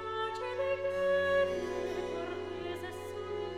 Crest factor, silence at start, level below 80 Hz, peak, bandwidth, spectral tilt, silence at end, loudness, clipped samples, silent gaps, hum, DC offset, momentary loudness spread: 14 dB; 0 s; -64 dBFS; -20 dBFS; 13.5 kHz; -5 dB/octave; 0 s; -34 LUFS; under 0.1%; none; none; 0.1%; 10 LU